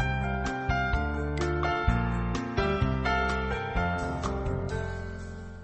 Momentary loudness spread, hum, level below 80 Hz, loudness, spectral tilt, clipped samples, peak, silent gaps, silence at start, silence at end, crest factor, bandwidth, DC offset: 7 LU; none; -34 dBFS; -30 LUFS; -6.5 dB/octave; under 0.1%; -12 dBFS; none; 0 s; 0 s; 16 dB; 8.6 kHz; under 0.1%